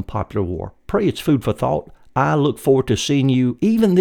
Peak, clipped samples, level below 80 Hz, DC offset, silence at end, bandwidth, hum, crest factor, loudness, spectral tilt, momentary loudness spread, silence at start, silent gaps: -2 dBFS; under 0.1%; -42 dBFS; under 0.1%; 0 s; 18 kHz; none; 16 dB; -19 LUFS; -6.5 dB/octave; 8 LU; 0 s; none